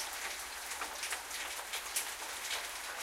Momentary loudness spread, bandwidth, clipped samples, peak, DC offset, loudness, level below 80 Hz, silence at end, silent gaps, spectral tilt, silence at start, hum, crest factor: 3 LU; 16.5 kHz; under 0.1%; -20 dBFS; under 0.1%; -38 LUFS; -66 dBFS; 0 s; none; 1.5 dB/octave; 0 s; none; 22 dB